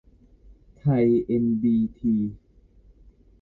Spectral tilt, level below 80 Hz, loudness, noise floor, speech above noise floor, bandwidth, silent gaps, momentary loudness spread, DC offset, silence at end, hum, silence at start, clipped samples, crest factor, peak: -12 dB/octave; -52 dBFS; -23 LUFS; -54 dBFS; 33 dB; 4.2 kHz; none; 6 LU; under 0.1%; 1.05 s; none; 0.5 s; under 0.1%; 14 dB; -12 dBFS